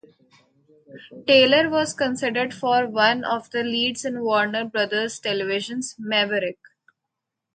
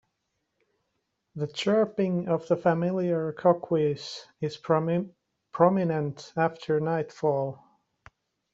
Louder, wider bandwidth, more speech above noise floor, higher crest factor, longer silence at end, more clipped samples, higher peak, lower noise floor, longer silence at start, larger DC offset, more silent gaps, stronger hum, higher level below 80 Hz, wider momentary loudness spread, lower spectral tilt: first, -22 LUFS vs -27 LUFS; first, 9.4 kHz vs 8 kHz; first, 60 dB vs 53 dB; about the same, 20 dB vs 22 dB; about the same, 1.05 s vs 1 s; neither; about the same, -4 dBFS vs -6 dBFS; first, -83 dBFS vs -79 dBFS; second, 0.9 s vs 1.35 s; neither; neither; neither; about the same, -68 dBFS vs -70 dBFS; about the same, 9 LU vs 11 LU; second, -3 dB/octave vs -7 dB/octave